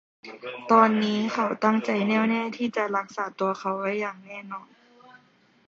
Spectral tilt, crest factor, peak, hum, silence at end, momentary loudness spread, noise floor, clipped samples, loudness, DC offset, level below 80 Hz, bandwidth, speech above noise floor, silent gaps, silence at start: -6 dB/octave; 22 dB; -4 dBFS; none; 1.05 s; 19 LU; -61 dBFS; under 0.1%; -24 LUFS; under 0.1%; -74 dBFS; 7.4 kHz; 36 dB; none; 0.25 s